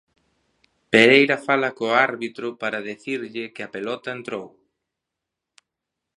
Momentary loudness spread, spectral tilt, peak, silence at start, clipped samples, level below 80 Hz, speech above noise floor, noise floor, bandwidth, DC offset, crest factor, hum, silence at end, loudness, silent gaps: 18 LU; -4.5 dB/octave; 0 dBFS; 0.9 s; under 0.1%; -72 dBFS; 63 dB; -84 dBFS; 11 kHz; under 0.1%; 24 dB; none; 1.7 s; -21 LUFS; none